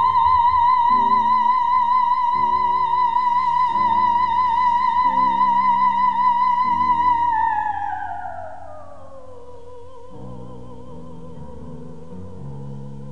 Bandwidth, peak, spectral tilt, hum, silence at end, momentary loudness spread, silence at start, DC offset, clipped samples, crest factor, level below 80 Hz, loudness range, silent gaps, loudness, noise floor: 6.2 kHz; -6 dBFS; -5.5 dB/octave; none; 0 s; 22 LU; 0 s; 2%; under 0.1%; 12 dB; -50 dBFS; 21 LU; none; -18 LUFS; -41 dBFS